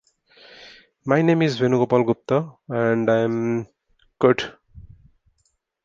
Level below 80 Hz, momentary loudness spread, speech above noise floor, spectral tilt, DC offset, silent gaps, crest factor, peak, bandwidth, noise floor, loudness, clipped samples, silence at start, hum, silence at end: -58 dBFS; 12 LU; 50 dB; -7.5 dB/octave; under 0.1%; none; 20 dB; -2 dBFS; 7.6 kHz; -70 dBFS; -21 LUFS; under 0.1%; 0.6 s; none; 1.05 s